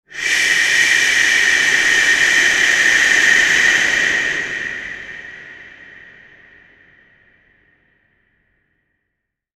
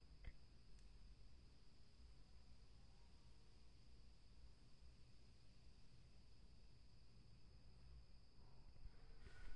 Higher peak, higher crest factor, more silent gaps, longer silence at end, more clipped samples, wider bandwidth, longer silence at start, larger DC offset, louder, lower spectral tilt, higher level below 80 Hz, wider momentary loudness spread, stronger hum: first, -2 dBFS vs -40 dBFS; about the same, 16 dB vs 20 dB; neither; first, 3.9 s vs 0 s; neither; first, 14 kHz vs 10 kHz; about the same, 0.1 s vs 0 s; neither; first, -12 LUFS vs -68 LUFS; second, 1 dB/octave vs -5 dB/octave; first, -52 dBFS vs -66 dBFS; first, 17 LU vs 4 LU; neither